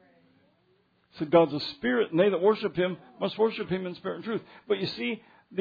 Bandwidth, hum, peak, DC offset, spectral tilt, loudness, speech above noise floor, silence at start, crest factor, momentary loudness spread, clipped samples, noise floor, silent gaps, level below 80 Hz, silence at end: 5 kHz; none; -8 dBFS; under 0.1%; -8 dB/octave; -28 LUFS; 40 dB; 1.15 s; 20 dB; 12 LU; under 0.1%; -68 dBFS; none; -66 dBFS; 0 s